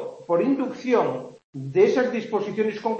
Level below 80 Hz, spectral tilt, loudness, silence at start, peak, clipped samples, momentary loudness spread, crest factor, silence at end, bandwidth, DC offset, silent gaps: -70 dBFS; -7 dB/octave; -23 LUFS; 0 s; -6 dBFS; under 0.1%; 12 LU; 16 dB; 0 s; 8 kHz; under 0.1%; 1.44-1.53 s